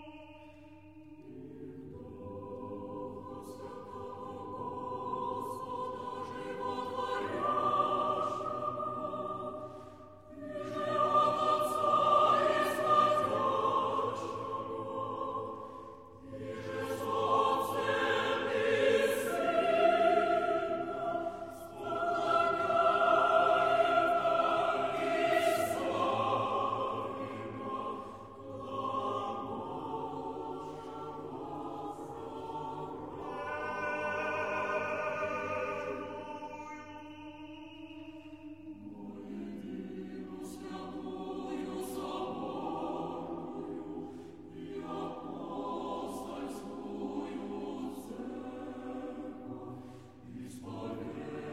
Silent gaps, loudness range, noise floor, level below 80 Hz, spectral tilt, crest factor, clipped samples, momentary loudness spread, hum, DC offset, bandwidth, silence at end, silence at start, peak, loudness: none; 15 LU; -54 dBFS; -68 dBFS; -5 dB/octave; 20 dB; under 0.1%; 20 LU; none; under 0.1%; 16 kHz; 0 s; 0 s; -14 dBFS; -34 LUFS